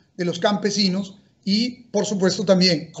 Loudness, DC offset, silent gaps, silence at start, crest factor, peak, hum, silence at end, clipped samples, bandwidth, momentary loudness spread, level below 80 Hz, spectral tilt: -21 LUFS; under 0.1%; none; 0.2 s; 18 dB; -4 dBFS; none; 0 s; under 0.1%; 8.2 kHz; 11 LU; -64 dBFS; -4.5 dB/octave